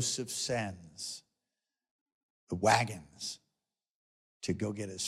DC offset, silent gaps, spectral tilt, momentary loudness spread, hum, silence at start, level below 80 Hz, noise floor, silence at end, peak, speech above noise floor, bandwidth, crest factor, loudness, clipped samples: under 0.1%; 1.91-2.06 s, 2.12-2.47 s, 3.90-4.40 s; -3.5 dB/octave; 15 LU; none; 0 s; -70 dBFS; under -90 dBFS; 0 s; -10 dBFS; over 56 dB; 16 kHz; 26 dB; -34 LUFS; under 0.1%